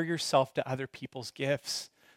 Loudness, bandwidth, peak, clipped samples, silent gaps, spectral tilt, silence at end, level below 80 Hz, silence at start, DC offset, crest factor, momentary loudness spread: -32 LUFS; 16.5 kHz; -12 dBFS; under 0.1%; none; -4 dB/octave; 0.3 s; -74 dBFS; 0 s; under 0.1%; 22 dB; 13 LU